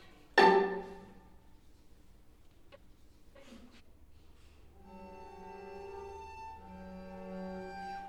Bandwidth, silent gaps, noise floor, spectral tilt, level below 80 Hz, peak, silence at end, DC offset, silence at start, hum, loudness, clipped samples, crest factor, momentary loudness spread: 12.5 kHz; none; -58 dBFS; -5 dB/octave; -60 dBFS; -12 dBFS; 0 s; under 0.1%; 0 s; none; -32 LUFS; under 0.1%; 26 dB; 30 LU